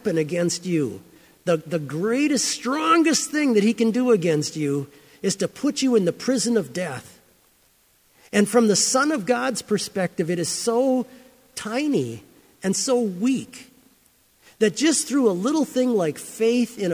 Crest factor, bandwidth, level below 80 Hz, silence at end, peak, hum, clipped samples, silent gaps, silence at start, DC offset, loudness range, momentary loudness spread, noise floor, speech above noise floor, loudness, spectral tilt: 16 dB; 16 kHz; -66 dBFS; 0 s; -6 dBFS; none; under 0.1%; none; 0.05 s; under 0.1%; 4 LU; 11 LU; -60 dBFS; 39 dB; -22 LUFS; -4 dB/octave